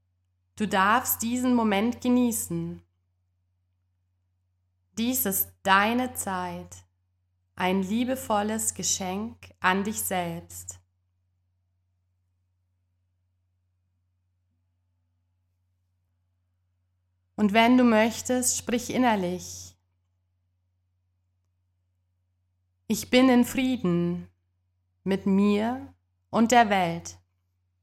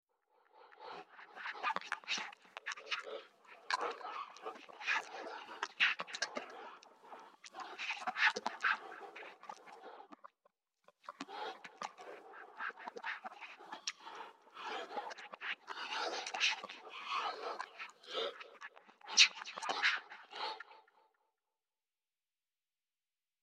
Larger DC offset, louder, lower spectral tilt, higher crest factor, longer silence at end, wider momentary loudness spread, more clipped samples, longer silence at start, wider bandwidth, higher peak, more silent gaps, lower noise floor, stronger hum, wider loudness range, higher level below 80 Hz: neither; first, -25 LUFS vs -38 LUFS; first, -4 dB/octave vs 1 dB/octave; second, 24 dB vs 32 dB; second, 0.7 s vs 2.6 s; second, 17 LU vs 21 LU; neither; about the same, 0.55 s vs 0.55 s; first, 17 kHz vs 15 kHz; first, -4 dBFS vs -10 dBFS; neither; second, -74 dBFS vs under -90 dBFS; neither; second, 8 LU vs 13 LU; first, -66 dBFS vs under -90 dBFS